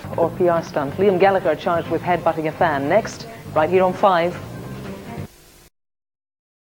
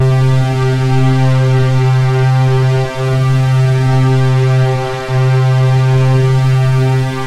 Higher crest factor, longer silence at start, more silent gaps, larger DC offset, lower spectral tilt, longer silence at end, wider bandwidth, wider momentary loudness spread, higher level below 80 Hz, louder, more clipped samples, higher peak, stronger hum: first, 18 dB vs 10 dB; about the same, 0 s vs 0 s; neither; neither; about the same, -6.5 dB/octave vs -7.5 dB/octave; first, 1.5 s vs 0 s; first, 18 kHz vs 9.2 kHz; first, 17 LU vs 3 LU; second, -50 dBFS vs -36 dBFS; second, -19 LUFS vs -12 LUFS; neither; about the same, -2 dBFS vs -2 dBFS; neither